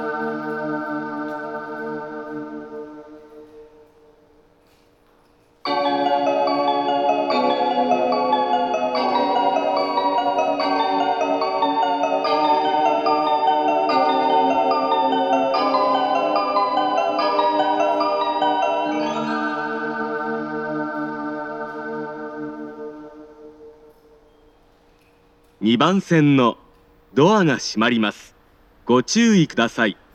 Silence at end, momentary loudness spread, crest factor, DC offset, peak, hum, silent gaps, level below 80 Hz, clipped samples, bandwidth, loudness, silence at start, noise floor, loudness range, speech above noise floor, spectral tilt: 0.2 s; 13 LU; 18 dB; under 0.1%; -2 dBFS; none; none; -62 dBFS; under 0.1%; 8.8 kHz; -20 LUFS; 0 s; -56 dBFS; 14 LU; 39 dB; -5 dB/octave